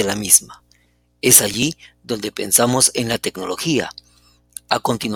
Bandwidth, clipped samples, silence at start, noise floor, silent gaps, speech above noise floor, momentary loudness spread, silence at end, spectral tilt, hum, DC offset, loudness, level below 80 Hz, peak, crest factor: 19 kHz; under 0.1%; 0 s; -58 dBFS; none; 40 dB; 17 LU; 0 s; -2.5 dB/octave; 60 Hz at -45 dBFS; under 0.1%; -16 LUFS; -52 dBFS; 0 dBFS; 20 dB